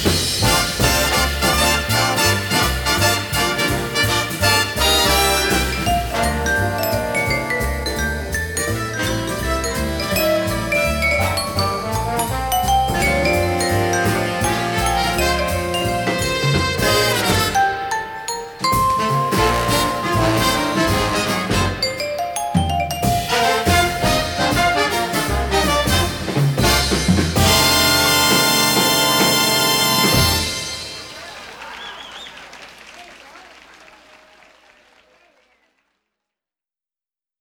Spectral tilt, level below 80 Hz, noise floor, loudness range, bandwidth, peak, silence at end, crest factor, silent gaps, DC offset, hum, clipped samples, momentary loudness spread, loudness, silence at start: -3.5 dB/octave; -32 dBFS; under -90 dBFS; 6 LU; 19.5 kHz; -2 dBFS; 3.9 s; 16 dB; none; under 0.1%; none; under 0.1%; 9 LU; -17 LUFS; 0 s